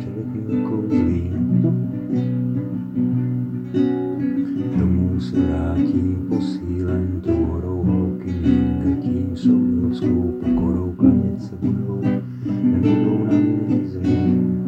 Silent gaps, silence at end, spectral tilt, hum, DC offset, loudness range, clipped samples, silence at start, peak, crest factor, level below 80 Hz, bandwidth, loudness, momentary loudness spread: none; 0 s; -10 dB/octave; none; under 0.1%; 2 LU; under 0.1%; 0 s; -2 dBFS; 18 dB; -38 dBFS; 7.6 kHz; -20 LUFS; 6 LU